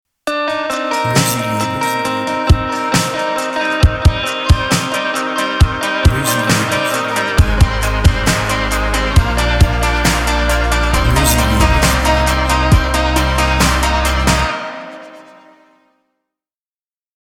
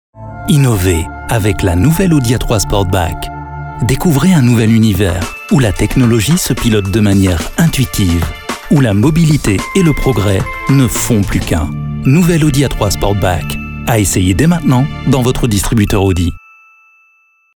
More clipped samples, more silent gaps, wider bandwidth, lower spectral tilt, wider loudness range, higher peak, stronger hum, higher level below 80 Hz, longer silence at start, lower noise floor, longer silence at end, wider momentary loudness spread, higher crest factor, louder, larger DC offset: neither; neither; about the same, 19 kHz vs over 20 kHz; about the same, -4.5 dB/octave vs -5.5 dB/octave; about the same, 3 LU vs 2 LU; about the same, 0 dBFS vs 0 dBFS; neither; about the same, -20 dBFS vs -24 dBFS; about the same, 0.25 s vs 0.15 s; first, under -90 dBFS vs -53 dBFS; first, 2 s vs 1.15 s; about the same, 5 LU vs 7 LU; about the same, 14 dB vs 12 dB; about the same, -14 LUFS vs -12 LUFS; neither